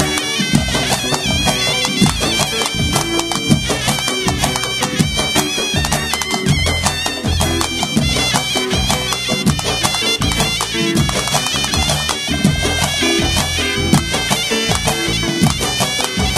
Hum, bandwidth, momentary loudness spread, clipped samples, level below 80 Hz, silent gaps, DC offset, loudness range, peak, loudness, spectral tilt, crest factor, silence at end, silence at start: none; 14 kHz; 2 LU; under 0.1%; -30 dBFS; none; under 0.1%; 1 LU; 0 dBFS; -15 LUFS; -3 dB/octave; 16 dB; 0 s; 0 s